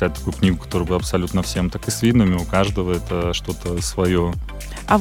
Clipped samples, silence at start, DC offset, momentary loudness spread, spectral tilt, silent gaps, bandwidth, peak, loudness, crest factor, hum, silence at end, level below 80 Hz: under 0.1%; 0 s; under 0.1%; 7 LU; -5.5 dB/octave; none; 17 kHz; -2 dBFS; -21 LUFS; 18 dB; none; 0 s; -32 dBFS